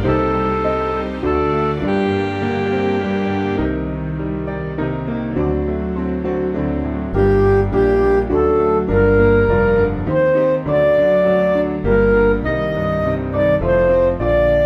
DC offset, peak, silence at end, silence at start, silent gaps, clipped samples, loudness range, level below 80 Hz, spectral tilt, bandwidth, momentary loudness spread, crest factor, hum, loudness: under 0.1%; -2 dBFS; 0 s; 0 s; none; under 0.1%; 6 LU; -28 dBFS; -9 dB/octave; 7.4 kHz; 8 LU; 14 dB; none; -17 LUFS